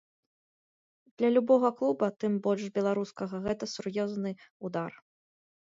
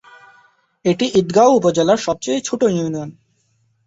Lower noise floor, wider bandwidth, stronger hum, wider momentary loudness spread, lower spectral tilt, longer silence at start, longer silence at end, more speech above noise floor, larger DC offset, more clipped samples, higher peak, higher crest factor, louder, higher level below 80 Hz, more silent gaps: first, under -90 dBFS vs -62 dBFS; about the same, 7.8 kHz vs 8 kHz; neither; about the same, 12 LU vs 11 LU; first, -6.5 dB/octave vs -5 dB/octave; first, 1.2 s vs 0.85 s; about the same, 0.7 s vs 0.75 s; first, over 61 dB vs 47 dB; neither; neither; second, -12 dBFS vs -2 dBFS; about the same, 20 dB vs 16 dB; second, -30 LUFS vs -16 LUFS; second, -68 dBFS vs -56 dBFS; first, 4.51-4.60 s vs none